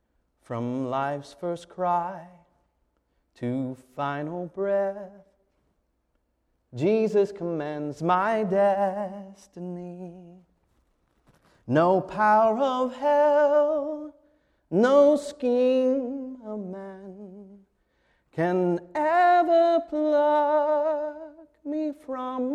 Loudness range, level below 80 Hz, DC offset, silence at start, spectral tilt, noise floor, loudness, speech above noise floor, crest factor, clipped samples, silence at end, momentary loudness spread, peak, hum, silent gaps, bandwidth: 9 LU; -68 dBFS; under 0.1%; 0.5 s; -7 dB/octave; -73 dBFS; -24 LUFS; 49 dB; 16 dB; under 0.1%; 0 s; 20 LU; -10 dBFS; none; none; 10 kHz